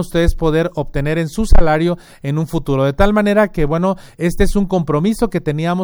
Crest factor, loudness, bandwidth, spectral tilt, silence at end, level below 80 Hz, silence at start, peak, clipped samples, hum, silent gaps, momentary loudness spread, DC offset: 14 dB; -17 LUFS; 16 kHz; -7 dB/octave; 0 s; -20 dBFS; 0 s; 0 dBFS; 0.3%; none; none; 6 LU; under 0.1%